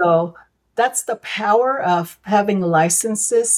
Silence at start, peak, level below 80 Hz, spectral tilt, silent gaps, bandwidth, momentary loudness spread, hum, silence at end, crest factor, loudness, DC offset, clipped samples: 0 s; -4 dBFS; -64 dBFS; -3.5 dB/octave; none; 17.5 kHz; 7 LU; none; 0 s; 14 dB; -18 LUFS; under 0.1%; under 0.1%